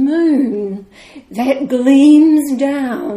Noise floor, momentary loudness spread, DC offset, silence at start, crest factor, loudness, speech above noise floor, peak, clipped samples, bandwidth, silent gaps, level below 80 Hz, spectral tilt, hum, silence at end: -38 dBFS; 16 LU; under 0.1%; 0 s; 12 dB; -12 LUFS; 27 dB; 0 dBFS; under 0.1%; 14.5 kHz; none; -56 dBFS; -5.5 dB/octave; none; 0 s